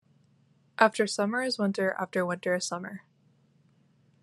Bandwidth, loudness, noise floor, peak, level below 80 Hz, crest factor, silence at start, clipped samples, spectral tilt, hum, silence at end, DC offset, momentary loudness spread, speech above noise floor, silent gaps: 12.5 kHz; -28 LUFS; -65 dBFS; -4 dBFS; -80 dBFS; 26 dB; 0.8 s; under 0.1%; -4 dB/octave; none; 1.25 s; under 0.1%; 16 LU; 37 dB; none